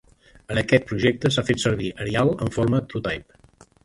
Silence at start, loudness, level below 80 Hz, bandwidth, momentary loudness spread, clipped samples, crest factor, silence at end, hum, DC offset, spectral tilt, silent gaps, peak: 0.5 s; -23 LUFS; -46 dBFS; 11.5 kHz; 8 LU; under 0.1%; 20 dB; 0.6 s; none; under 0.1%; -5.5 dB/octave; none; -4 dBFS